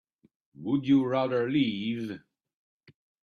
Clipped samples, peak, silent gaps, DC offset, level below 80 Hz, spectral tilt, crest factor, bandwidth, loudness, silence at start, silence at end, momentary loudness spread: under 0.1%; -14 dBFS; none; under 0.1%; -70 dBFS; -8 dB/octave; 16 dB; 6.6 kHz; -28 LUFS; 0.6 s; 1.05 s; 15 LU